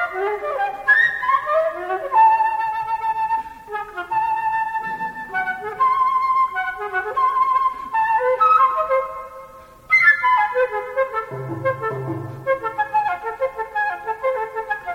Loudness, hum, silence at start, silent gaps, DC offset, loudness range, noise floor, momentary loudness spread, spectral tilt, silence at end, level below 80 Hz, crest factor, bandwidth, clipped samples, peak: -20 LUFS; none; 0 s; none; under 0.1%; 6 LU; -42 dBFS; 12 LU; -5.5 dB/octave; 0 s; -56 dBFS; 16 dB; 16 kHz; under 0.1%; -4 dBFS